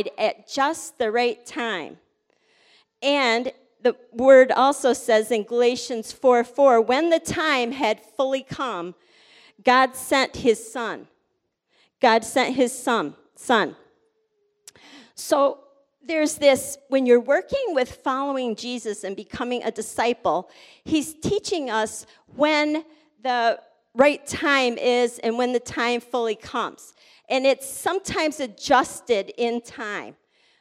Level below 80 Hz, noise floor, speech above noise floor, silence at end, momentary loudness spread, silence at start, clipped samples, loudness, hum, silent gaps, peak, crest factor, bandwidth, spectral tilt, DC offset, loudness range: -60 dBFS; -74 dBFS; 52 dB; 0.5 s; 12 LU; 0 s; under 0.1%; -22 LUFS; none; none; -4 dBFS; 20 dB; 15.5 kHz; -3 dB/octave; under 0.1%; 6 LU